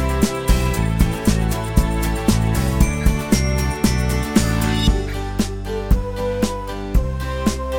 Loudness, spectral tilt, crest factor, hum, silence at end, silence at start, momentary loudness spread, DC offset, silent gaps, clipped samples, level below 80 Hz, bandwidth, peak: -20 LUFS; -5.5 dB/octave; 16 dB; none; 0 s; 0 s; 5 LU; under 0.1%; none; under 0.1%; -22 dBFS; 17.5 kHz; -2 dBFS